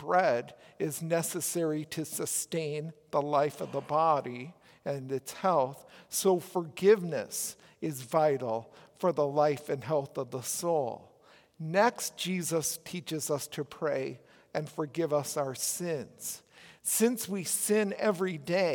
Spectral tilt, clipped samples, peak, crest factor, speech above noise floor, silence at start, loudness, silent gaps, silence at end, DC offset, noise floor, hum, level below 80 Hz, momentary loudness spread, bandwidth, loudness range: -4 dB/octave; under 0.1%; -12 dBFS; 20 dB; 30 dB; 0 s; -31 LUFS; none; 0 s; under 0.1%; -61 dBFS; none; -78 dBFS; 11 LU; 18 kHz; 4 LU